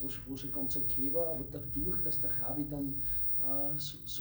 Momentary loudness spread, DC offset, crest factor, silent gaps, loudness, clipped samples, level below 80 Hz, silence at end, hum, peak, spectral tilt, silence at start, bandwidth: 9 LU; under 0.1%; 12 dB; none; -31 LUFS; under 0.1%; -52 dBFS; 0 s; none; -22 dBFS; -6 dB/octave; 0 s; over 20 kHz